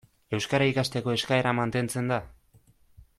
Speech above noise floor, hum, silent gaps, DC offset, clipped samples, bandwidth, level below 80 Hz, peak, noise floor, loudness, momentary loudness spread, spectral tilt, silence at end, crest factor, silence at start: 34 dB; none; none; under 0.1%; under 0.1%; 14.5 kHz; -58 dBFS; -10 dBFS; -61 dBFS; -27 LUFS; 7 LU; -5 dB/octave; 0.15 s; 18 dB; 0.3 s